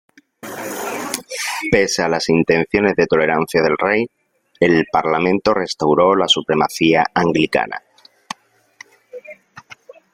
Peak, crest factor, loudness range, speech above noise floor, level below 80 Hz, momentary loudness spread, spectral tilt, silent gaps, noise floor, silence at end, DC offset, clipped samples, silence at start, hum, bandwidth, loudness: 0 dBFS; 18 dB; 4 LU; 30 dB; -50 dBFS; 19 LU; -4.5 dB/octave; none; -46 dBFS; 0.55 s; under 0.1%; under 0.1%; 0.45 s; none; 16.5 kHz; -17 LUFS